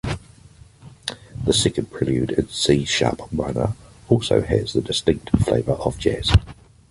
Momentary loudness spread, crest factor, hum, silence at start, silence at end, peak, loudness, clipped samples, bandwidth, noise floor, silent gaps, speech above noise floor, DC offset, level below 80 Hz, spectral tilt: 12 LU; 18 dB; none; 0.05 s; 0.4 s; -2 dBFS; -21 LUFS; under 0.1%; 11.5 kHz; -48 dBFS; none; 27 dB; under 0.1%; -34 dBFS; -5 dB/octave